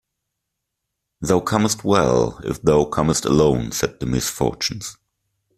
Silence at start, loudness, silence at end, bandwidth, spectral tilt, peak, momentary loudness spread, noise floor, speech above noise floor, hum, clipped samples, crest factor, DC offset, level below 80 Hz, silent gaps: 1.2 s; -19 LUFS; 0.65 s; 15.5 kHz; -5 dB/octave; 0 dBFS; 8 LU; -79 dBFS; 60 dB; none; under 0.1%; 20 dB; under 0.1%; -42 dBFS; none